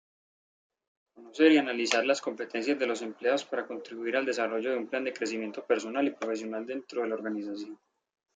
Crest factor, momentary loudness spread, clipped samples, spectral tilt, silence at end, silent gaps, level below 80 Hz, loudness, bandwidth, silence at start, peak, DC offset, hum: 22 dB; 11 LU; under 0.1%; -3 dB/octave; 0.6 s; none; -84 dBFS; -30 LUFS; 9.4 kHz; 1.15 s; -8 dBFS; under 0.1%; none